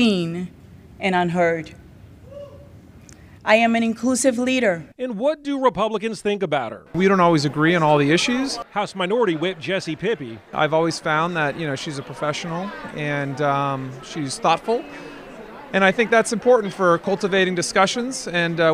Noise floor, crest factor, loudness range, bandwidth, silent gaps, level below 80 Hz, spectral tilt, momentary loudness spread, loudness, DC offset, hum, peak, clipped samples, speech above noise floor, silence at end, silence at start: -45 dBFS; 20 dB; 5 LU; 14.5 kHz; none; -54 dBFS; -4.5 dB/octave; 13 LU; -21 LUFS; under 0.1%; none; -2 dBFS; under 0.1%; 24 dB; 0 s; 0 s